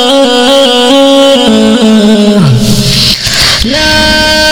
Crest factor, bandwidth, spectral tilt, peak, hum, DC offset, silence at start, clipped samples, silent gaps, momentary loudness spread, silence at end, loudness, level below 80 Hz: 6 dB; over 20 kHz; -4 dB/octave; 0 dBFS; none; under 0.1%; 0 s; 10%; none; 2 LU; 0 s; -5 LUFS; -24 dBFS